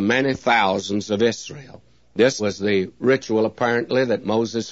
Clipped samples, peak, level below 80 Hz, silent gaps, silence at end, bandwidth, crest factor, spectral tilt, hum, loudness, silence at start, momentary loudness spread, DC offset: under 0.1%; -4 dBFS; -60 dBFS; none; 0 s; 8 kHz; 18 dB; -5 dB/octave; none; -20 LUFS; 0 s; 6 LU; 0.2%